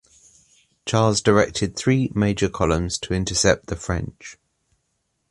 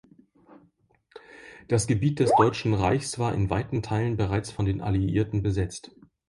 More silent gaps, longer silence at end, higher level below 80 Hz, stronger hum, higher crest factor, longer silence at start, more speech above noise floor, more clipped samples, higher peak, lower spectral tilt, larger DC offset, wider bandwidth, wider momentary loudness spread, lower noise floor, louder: neither; first, 0.95 s vs 0.5 s; first, -38 dBFS vs -44 dBFS; neither; about the same, 20 dB vs 18 dB; first, 0.85 s vs 0.5 s; first, 52 dB vs 40 dB; neither; first, -2 dBFS vs -8 dBFS; second, -4.5 dB/octave vs -6.5 dB/octave; neither; about the same, 11.5 kHz vs 11.5 kHz; about the same, 12 LU vs 10 LU; first, -73 dBFS vs -65 dBFS; first, -21 LUFS vs -26 LUFS